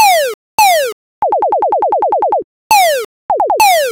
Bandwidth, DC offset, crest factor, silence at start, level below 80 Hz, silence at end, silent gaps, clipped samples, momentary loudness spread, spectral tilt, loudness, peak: 18 kHz; under 0.1%; 10 dB; 0 s; -52 dBFS; 0 s; 0.34-0.58 s, 0.93-1.22 s, 2.44-2.70 s, 3.05-3.29 s; under 0.1%; 9 LU; 0 dB/octave; -12 LUFS; -2 dBFS